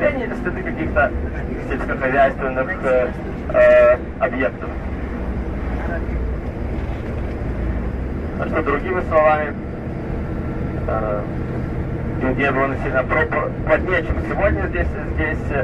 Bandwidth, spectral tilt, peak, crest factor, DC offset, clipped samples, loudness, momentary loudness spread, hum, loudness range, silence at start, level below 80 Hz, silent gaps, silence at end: 8.2 kHz; -8.5 dB/octave; -4 dBFS; 16 dB; under 0.1%; under 0.1%; -20 LUFS; 10 LU; none; 7 LU; 0 s; -28 dBFS; none; 0 s